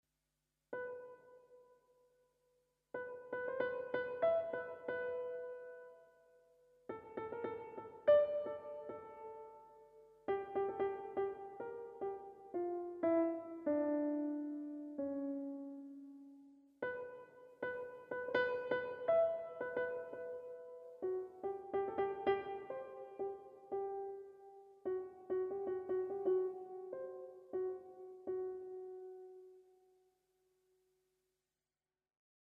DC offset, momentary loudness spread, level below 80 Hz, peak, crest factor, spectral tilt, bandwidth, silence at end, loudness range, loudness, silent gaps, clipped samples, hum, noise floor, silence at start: under 0.1%; 17 LU; -82 dBFS; -20 dBFS; 22 dB; -7.5 dB/octave; 5.4 kHz; 2.8 s; 8 LU; -41 LUFS; none; under 0.1%; none; under -90 dBFS; 0.7 s